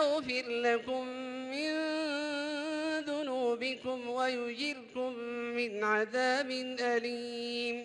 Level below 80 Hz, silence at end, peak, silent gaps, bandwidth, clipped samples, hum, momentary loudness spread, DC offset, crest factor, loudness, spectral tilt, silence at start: -78 dBFS; 0 s; -16 dBFS; none; 11.5 kHz; under 0.1%; none; 7 LU; under 0.1%; 18 dB; -34 LUFS; -3 dB/octave; 0 s